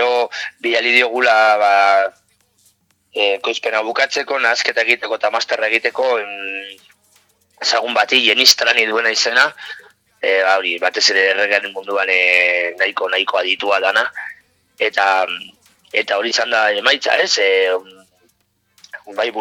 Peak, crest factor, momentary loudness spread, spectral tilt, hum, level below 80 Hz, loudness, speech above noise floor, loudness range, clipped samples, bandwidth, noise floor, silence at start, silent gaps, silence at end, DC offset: 0 dBFS; 18 dB; 11 LU; 0.5 dB/octave; none; -72 dBFS; -15 LUFS; 47 dB; 4 LU; under 0.1%; over 20 kHz; -63 dBFS; 0 s; none; 0 s; under 0.1%